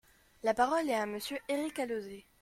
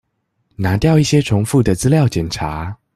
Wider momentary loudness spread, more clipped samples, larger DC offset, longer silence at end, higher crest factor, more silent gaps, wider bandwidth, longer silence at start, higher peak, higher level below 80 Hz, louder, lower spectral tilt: about the same, 9 LU vs 9 LU; neither; neither; about the same, 0.2 s vs 0.2 s; about the same, 18 dB vs 14 dB; neither; first, 16.5 kHz vs 13.5 kHz; second, 0.45 s vs 0.6 s; second, -16 dBFS vs -2 dBFS; second, -68 dBFS vs -38 dBFS; second, -34 LUFS vs -16 LUFS; second, -3.5 dB/octave vs -6 dB/octave